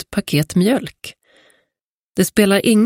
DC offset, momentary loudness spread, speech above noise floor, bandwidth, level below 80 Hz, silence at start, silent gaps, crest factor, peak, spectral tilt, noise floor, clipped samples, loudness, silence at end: under 0.1%; 19 LU; 66 dB; 16.5 kHz; -50 dBFS; 0 s; 1.81-2.13 s; 18 dB; 0 dBFS; -5 dB/octave; -81 dBFS; under 0.1%; -17 LUFS; 0 s